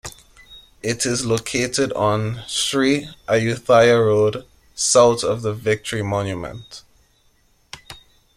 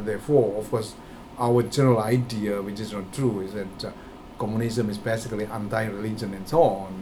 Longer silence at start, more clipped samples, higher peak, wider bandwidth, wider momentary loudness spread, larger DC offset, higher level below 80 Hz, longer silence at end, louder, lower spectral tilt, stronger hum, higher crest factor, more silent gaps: about the same, 0.05 s vs 0 s; neither; first, -2 dBFS vs -6 dBFS; second, 15 kHz vs 17.5 kHz; first, 23 LU vs 14 LU; neither; about the same, -50 dBFS vs -50 dBFS; first, 0.4 s vs 0 s; first, -19 LUFS vs -25 LUFS; second, -4 dB/octave vs -6.5 dB/octave; neither; about the same, 18 dB vs 20 dB; neither